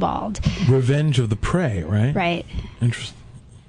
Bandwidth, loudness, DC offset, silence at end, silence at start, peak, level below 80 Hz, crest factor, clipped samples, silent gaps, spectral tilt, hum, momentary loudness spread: 10.5 kHz; -21 LUFS; under 0.1%; 0.1 s; 0 s; -6 dBFS; -36 dBFS; 16 dB; under 0.1%; none; -6.5 dB/octave; none; 9 LU